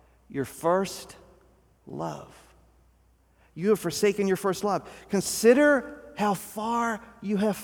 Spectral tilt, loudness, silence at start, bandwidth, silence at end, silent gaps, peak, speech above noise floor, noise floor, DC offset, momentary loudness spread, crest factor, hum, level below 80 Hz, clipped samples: -4.5 dB/octave; -26 LUFS; 0.3 s; over 20 kHz; 0 s; none; -8 dBFS; 36 dB; -62 dBFS; under 0.1%; 16 LU; 20 dB; none; -60 dBFS; under 0.1%